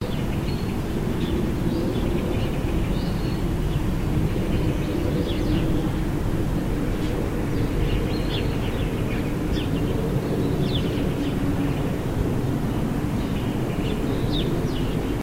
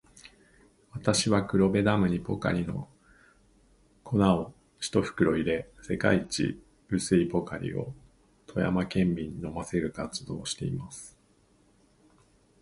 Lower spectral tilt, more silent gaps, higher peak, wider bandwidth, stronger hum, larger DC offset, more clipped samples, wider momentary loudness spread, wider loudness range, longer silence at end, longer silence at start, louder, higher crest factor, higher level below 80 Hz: first, -7 dB/octave vs -5.5 dB/octave; neither; about the same, -10 dBFS vs -8 dBFS; first, 16 kHz vs 11.5 kHz; neither; neither; neither; second, 2 LU vs 13 LU; second, 1 LU vs 4 LU; second, 0 s vs 1.55 s; second, 0 s vs 0.25 s; first, -25 LUFS vs -29 LUFS; second, 14 dB vs 22 dB; first, -30 dBFS vs -52 dBFS